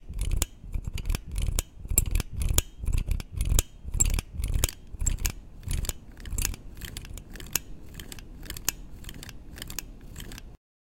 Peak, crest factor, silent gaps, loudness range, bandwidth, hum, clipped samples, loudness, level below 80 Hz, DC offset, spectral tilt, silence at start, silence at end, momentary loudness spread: 0 dBFS; 30 dB; none; 7 LU; 17 kHz; none; under 0.1%; -31 LUFS; -32 dBFS; under 0.1%; -3 dB/octave; 0 s; 0.45 s; 17 LU